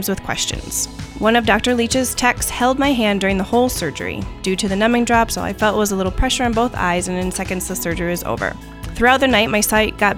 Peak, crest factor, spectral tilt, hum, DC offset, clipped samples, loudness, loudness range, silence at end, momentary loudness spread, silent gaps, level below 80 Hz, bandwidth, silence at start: 0 dBFS; 18 dB; -3.5 dB/octave; none; under 0.1%; under 0.1%; -18 LUFS; 2 LU; 0 s; 8 LU; none; -32 dBFS; 19.5 kHz; 0 s